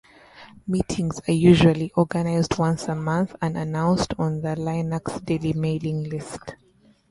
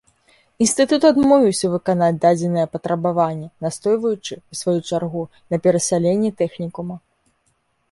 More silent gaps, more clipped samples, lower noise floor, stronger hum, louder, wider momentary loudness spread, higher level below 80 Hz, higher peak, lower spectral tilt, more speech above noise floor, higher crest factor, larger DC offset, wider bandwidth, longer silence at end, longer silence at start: neither; neither; second, -48 dBFS vs -66 dBFS; neither; second, -23 LUFS vs -19 LUFS; about the same, 12 LU vs 13 LU; first, -46 dBFS vs -58 dBFS; about the same, -2 dBFS vs -2 dBFS; first, -7 dB/octave vs -5.5 dB/octave; second, 25 dB vs 48 dB; about the same, 20 dB vs 18 dB; neither; about the same, 11.5 kHz vs 11.5 kHz; second, 0.55 s vs 0.95 s; second, 0.35 s vs 0.6 s